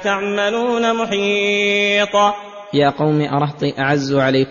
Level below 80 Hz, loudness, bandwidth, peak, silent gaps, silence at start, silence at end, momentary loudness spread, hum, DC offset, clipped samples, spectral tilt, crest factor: -54 dBFS; -17 LUFS; 7.4 kHz; -2 dBFS; none; 0 s; 0 s; 5 LU; none; under 0.1%; under 0.1%; -5 dB/octave; 14 dB